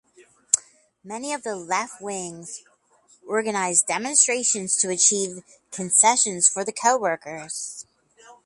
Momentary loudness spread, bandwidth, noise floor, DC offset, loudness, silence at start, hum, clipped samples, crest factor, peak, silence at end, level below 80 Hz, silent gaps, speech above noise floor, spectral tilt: 17 LU; 11.5 kHz; -59 dBFS; under 0.1%; -21 LUFS; 0.2 s; none; under 0.1%; 24 dB; 0 dBFS; 0.1 s; -72 dBFS; none; 36 dB; -1 dB/octave